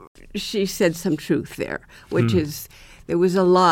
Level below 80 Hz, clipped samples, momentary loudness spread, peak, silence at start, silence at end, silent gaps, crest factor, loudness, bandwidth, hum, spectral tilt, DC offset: -48 dBFS; under 0.1%; 15 LU; -4 dBFS; 0 s; 0 s; 0.07-0.15 s; 18 dB; -22 LUFS; 17 kHz; none; -6 dB/octave; under 0.1%